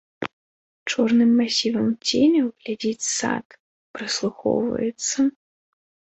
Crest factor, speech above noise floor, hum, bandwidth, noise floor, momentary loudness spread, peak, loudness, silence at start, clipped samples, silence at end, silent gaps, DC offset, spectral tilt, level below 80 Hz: 16 dB; over 69 dB; none; 8.2 kHz; under -90 dBFS; 16 LU; -8 dBFS; -22 LUFS; 0.2 s; under 0.1%; 0.85 s; 0.33-0.86 s, 3.45-3.50 s, 3.60-3.94 s; under 0.1%; -3.5 dB/octave; -64 dBFS